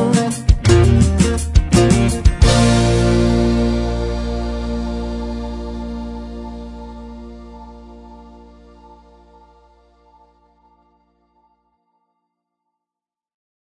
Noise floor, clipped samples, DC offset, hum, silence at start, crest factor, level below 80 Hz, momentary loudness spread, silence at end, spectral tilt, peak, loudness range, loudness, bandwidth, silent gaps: -89 dBFS; under 0.1%; under 0.1%; none; 0 s; 18 dB; -24 dBFS; 22 LU; 5.45 s; -6 dB/octave; 0 dBFS; 22 LU; -16 LUFS; 11.5 kHz; none